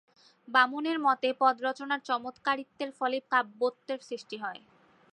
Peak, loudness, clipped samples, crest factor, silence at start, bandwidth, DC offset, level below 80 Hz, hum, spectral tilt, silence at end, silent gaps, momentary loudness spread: -10 dBFS; -30 LUFS; under 0.1%; 20 dB; 0.5 s; 10.5 kHz; under 0.1%; -86 dBFS; none; -3 dB/octave; 0.6 s; none; 13 LU